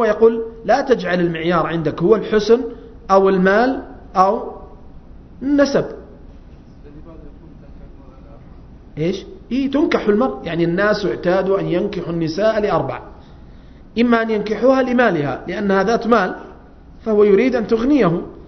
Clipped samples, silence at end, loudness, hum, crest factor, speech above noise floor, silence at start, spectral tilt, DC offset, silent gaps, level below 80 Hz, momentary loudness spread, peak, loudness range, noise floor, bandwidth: under 0.1%; 0 s; -17 LUFS; none; 18 dB; 25 dB; 0 s; -7 dB/octave; under 0.1%; none; -42 dBFS; 12 LU; 0 dBFS; 7 LU; -41 dBFS; 6.4 kHz